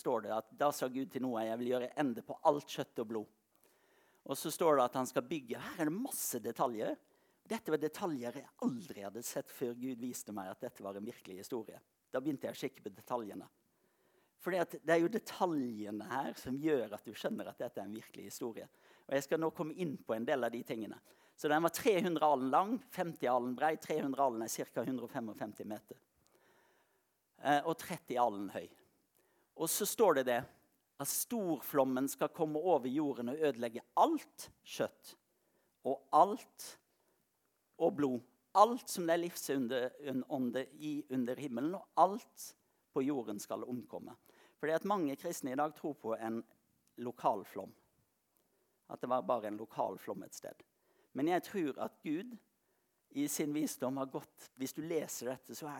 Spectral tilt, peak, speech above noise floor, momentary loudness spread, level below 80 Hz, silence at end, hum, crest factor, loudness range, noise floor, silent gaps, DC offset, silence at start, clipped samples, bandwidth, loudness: -4.5 dB/octave; -12 dBFS; 44 dB; 15 LU; -84 dBFS; 0 s; none; 26 dB; 7 LU; -81 dBFS; none; under 0.1%; 0.05 s; under 0.1%; 19 kHz; -37 LUFS